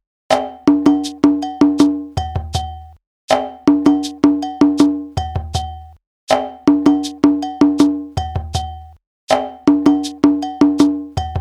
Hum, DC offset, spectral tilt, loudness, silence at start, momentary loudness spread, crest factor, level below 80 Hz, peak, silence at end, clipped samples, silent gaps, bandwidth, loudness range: none; under 0.1%; -6 dB/octave; -16 LUFS; 0.3 s; 10 LU; 16 dB; -36 dBFS; 0 dBFS; 0 s; under 0.1%; 3.07-3.28 s, 6.07-6.27 s, 9.07-9.27 s; 11 kHz; 0 LU